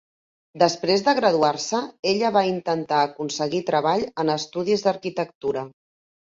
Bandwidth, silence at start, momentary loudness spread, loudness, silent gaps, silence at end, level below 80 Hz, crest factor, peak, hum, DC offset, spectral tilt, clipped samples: 7.8 kHz; 0.55 s; 8 LU; -23 LUFS; 1.99-2.03 s, 5.35-5.41 s; 0.6 s; -66 dBFS; 20 dB; -4 dBFS; none; under 0.1%; -4.5 dB/octave; under 0.1%